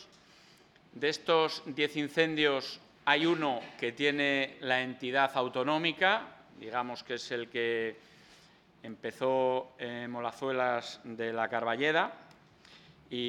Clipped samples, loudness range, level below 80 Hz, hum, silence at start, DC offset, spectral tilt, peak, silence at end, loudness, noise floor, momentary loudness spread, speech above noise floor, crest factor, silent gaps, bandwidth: under 0.1%; 5 LU; -76 dBFS; none; 0 s; under 0.1%; -4.5 dB/octave; -10 dBFS; 0 s; -31 LUFS; -61 dBFS; 12 LU; 29 dB; 24 dB; none; 13.5 kHz